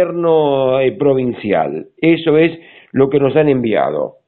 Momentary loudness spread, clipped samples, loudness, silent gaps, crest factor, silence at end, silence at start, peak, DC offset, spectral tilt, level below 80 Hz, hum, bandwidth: 5 LU; under 0.1%; -14 LUFS; none; 14 dB; 0.15 s; 0 s; 0 dBFS; under 0.1%; -12 dB/octave; -50 dBFS; none; 4.3 kHz